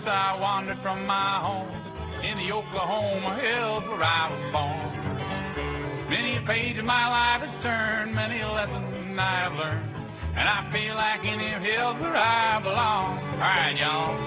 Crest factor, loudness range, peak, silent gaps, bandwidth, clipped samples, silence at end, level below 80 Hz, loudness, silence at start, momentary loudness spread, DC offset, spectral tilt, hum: 18 dB; 3 LU; -8 dBFS; none; 4 kHz; under 0.1%; 0 s; -46 dBFS; -26 LUFS; 0 s; 9 LU; under 0.1%; -2.5 dB/octave; none